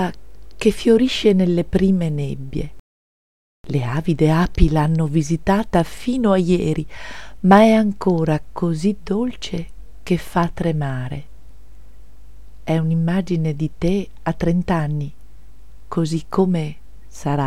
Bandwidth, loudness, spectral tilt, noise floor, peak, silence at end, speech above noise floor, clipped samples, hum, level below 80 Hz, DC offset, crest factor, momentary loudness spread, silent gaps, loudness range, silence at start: 13.5 kHz; -19 LUFS; -7 dB/octave; -44 dBFS; 0 dBFS; 0 s; 26 dB; under 0.1%; none; -34 dBFS; 2%; 18 dB; 13 LU; 2.79-3.64 s; 7 LU; 0 s